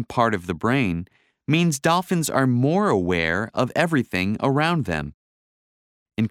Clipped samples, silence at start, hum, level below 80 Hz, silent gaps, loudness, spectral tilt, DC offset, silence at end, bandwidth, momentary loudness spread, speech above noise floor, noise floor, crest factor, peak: under 0.1%; 0 s; none; -50 dBFS; 5.14-6.06 s; -22 LUFS; -5.5 dB/octave; under 0.1%; 0 s; 16.5 kHz; 8 LU; over 69 dB; under -90 dBFS; 20 dB; -4 dBFS